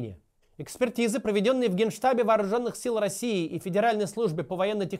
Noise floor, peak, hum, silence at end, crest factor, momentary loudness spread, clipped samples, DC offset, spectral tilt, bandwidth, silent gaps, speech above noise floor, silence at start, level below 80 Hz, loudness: -47 dBFS; -12 dBFS; none; 0 s; 16 dB; 6 LU; under 0.1%; under 0.1%; -5 dB/octave; 16 kHz; none; 21 dB; 0 s; -64 dBFS; -27 LUFS